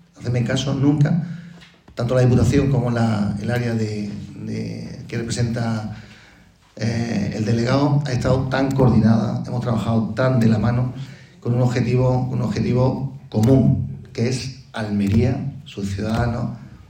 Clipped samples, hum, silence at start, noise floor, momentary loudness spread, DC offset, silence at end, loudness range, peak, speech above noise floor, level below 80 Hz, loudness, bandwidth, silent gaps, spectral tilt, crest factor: under 0.1%; none; 0.2 s; -50 dBFS; 13 LU; under 0.1%; 0.05 s; 6 LU; -4 dBFS; 32 dB; -42 dBFS; -20 LUFS; 9.8 kHz; none; -7.5 dB/octave; 16 dB